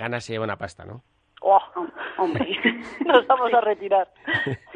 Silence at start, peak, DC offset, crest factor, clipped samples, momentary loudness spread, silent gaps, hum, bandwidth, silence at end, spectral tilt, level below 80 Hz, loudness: 0 s; -2 dBFS; under 0.1%; 22 dB; under 0.1%; 14 LU; none; none; 10 kHz; 0 s; -5.5 dB/octave; -58 dBFS; -22 LUFS